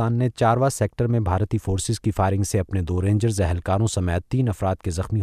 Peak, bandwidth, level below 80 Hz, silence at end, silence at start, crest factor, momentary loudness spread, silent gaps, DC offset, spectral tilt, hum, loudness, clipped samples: -8 dBFS; 14 kHz; -38 dBFS; 0 s; 0 s; 14 dB; 4 LU; none; under 0.1%; -6.5 dB/octave; none; -23 LUFS; under 0.1%